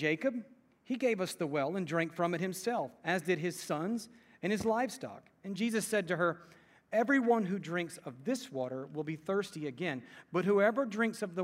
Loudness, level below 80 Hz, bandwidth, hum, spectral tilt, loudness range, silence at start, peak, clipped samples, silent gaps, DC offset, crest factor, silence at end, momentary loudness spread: -34 LUFS; -76 dBFS; 16 kHz; none; -5.5 dB/octave; 2 LU; 0 s; -16 dBFS; under 0.1%; none; under 0.1%; 18 dB; 0 s; 12 LU